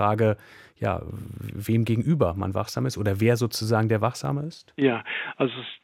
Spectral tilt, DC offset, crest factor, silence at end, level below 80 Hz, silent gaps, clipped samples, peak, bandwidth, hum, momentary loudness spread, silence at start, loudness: -6.5 dB/octave; under 0.1%; 18 dB; 0.1 s; -52 dBFS; none; under 0.1%; -8 dBFS; 16 kHz; none; 11 LU; 0 s; -25 LUFS